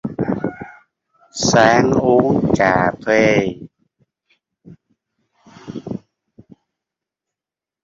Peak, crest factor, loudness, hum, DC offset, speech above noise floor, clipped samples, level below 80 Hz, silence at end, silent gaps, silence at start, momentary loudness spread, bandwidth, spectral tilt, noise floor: 0 dBFS; 18 dB; -15 LUFS; none; under 0.1%; 74 dB; under 0.1%; -48 dBFS; 1.85 s; none; 0.05 s; 20 LU; 7.8 kHz; -5 dB/octave; -88 dBFS